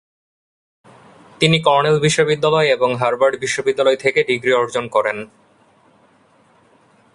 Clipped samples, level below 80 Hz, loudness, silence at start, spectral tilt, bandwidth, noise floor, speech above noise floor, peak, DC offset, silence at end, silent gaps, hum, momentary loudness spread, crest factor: under 0.1%; -58 dBFS; -16 LUFS; 1.4 s; -4.5 dB/octave; 11.5 kHz; -54 dBFS; 38 dB; 0 dBFS; under 0.1%; 1.9 s; none; none; 5 LU; 18 dB